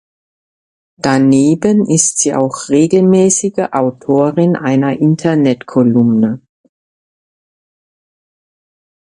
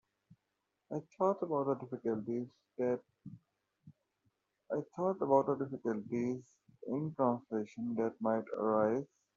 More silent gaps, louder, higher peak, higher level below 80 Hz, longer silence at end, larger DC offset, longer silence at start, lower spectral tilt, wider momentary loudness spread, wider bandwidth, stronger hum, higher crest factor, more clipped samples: neither; first, -12 LUFS vs -36 LUFS; first, 0 dBFS vs -16 dBFS; first, -56 dBFS vs -80 dBFS; first, 2.7 s vs 0.3 s; neither; first, 1.05 s vs 0.9 s; second, -5.5 dB/octave vs -9 dB/octave; second, 6 LU vs 13 LU; first, 11 kHz vs 7.2 kHz; neither; second, 14 dB vs 22 dB; neither